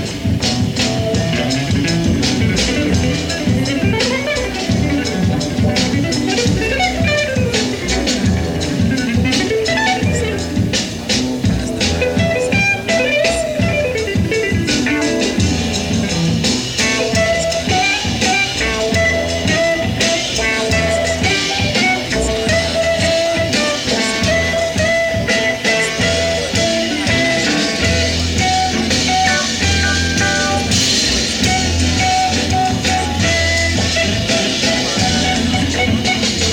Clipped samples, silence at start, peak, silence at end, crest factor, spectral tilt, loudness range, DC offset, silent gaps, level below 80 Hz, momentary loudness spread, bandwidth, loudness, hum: under 0.1%; 0 s; -2 dBFS; 0 s; 14 dB; -4 dB/octave; 2 LU; under 0.1%; none; -30 dBFS; 3 LU; 17 kHz; -15 LUFS; none